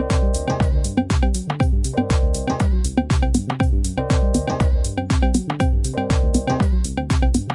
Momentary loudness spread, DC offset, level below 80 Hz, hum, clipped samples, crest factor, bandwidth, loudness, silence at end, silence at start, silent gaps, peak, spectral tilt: 2 LU; under 0.1%; -20 dBFS; none; under 0.1%; 14 dB; 11.5 kHz; -20 LUFS; 0 s; 0 s; none; -4 dBFS; -6 dB/octave